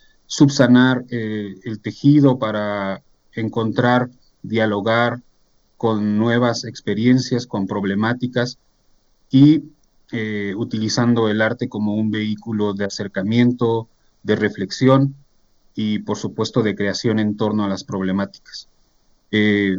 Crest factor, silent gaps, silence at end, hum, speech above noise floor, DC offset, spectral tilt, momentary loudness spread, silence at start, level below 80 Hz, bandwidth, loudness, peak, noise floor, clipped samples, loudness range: 18 dB; none; 0 s; none; 40 dB; under 0.1%; -6 dB/octave; 13 LU; 0.3 s; -60 dBFS; 7.8 kHz; -19 LUFS; -2 dBFS; -58 dBFS; under 0.1%; 3 LU